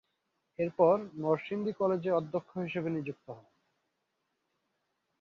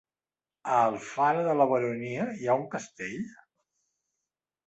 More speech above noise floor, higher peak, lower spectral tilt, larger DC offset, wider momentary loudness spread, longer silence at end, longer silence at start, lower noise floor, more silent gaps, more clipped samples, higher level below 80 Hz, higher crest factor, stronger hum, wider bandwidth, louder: second, 50 dB vs over 62 dB; about the same, -12 dBFS vs -10 dBFS; first, -9 dB/octave vs -6 dB/octave; neither; first, 20 LU vs 13 LU; first, 1.8 s vs 1.35 s; about the same, 0.6 s vs 0.65 s; second, -82 dBFS vs under -90 dBFS; neither; neither; about the same, -76 dBFS vs -74 dBFS; about the same, 22 dB vs 20 dB; neither; second, 6.6 kHz vs 8.2 kHz; second, -32 LUFS vs -28 LUFS